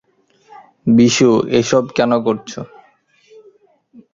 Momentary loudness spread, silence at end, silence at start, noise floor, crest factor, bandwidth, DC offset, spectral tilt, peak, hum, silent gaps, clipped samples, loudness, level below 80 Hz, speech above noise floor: 19 LU; 1.5 s; 0.85 s; -54 dBFS; 16 dB; 7.6 kHz; under 0.1%; -5 dB/octave; -2 dBFS; none; none; under 0.1%; -14 LUFS; -54 dBFS; 40 dB